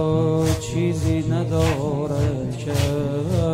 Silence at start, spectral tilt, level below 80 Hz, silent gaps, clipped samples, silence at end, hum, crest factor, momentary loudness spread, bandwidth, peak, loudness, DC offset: 0 s; -7 dB/octave; -38 dBFS; none; under 0.1%; 0 s; none; 14 dB; 4 LU; 16 kHz; -6 dBFS; -22 LUFS; under 0.1%